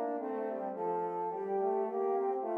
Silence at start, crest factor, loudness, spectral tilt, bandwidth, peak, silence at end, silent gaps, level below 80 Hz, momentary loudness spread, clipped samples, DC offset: 0 s; 12 dB; -35 LUFS; -9.5 dB/octave; 3.3 kHz; -22 dBFS; 0 s; none; under -90 dBFS; 4 LU; under 0.1%; under 0.1%